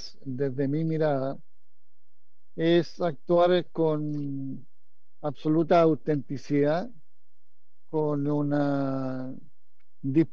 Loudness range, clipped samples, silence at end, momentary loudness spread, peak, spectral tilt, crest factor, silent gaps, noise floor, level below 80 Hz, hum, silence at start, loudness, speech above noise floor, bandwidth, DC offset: 3 LU; under 0.1%; 0.05 s; 15 LU; -10 dBFS; -8.5 dB/octave; 18 dB; none; -85 dBFS; -72 dBFS; none; 0 s; -27 LUFS; 59 dB; 7 kHz; 2%